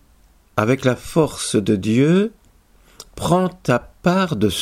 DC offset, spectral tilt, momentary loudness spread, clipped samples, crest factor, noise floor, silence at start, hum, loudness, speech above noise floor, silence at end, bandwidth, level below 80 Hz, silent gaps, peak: under 0.1%; -6 dB/octave; 8 LU; under 0.1%; 18 dB; -53 dBFS; 0.55 s; none; -19 LUFS; 35 dB; 0 s; 16 kHz; -46 dBFS; none; -2 dBFS